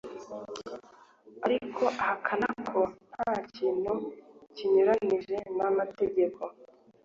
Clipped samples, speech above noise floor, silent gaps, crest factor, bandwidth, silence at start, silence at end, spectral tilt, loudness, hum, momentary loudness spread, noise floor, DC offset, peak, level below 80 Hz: under 0.1%; 27 dB; none; 20 dB; 7.6 kHz; 0.05 s; 0.4 s; -6 dB/octave; -30 LUFS; none; 16 LU; -56 dBFS; under 0.1%; -12 dBFS; -68 dBFS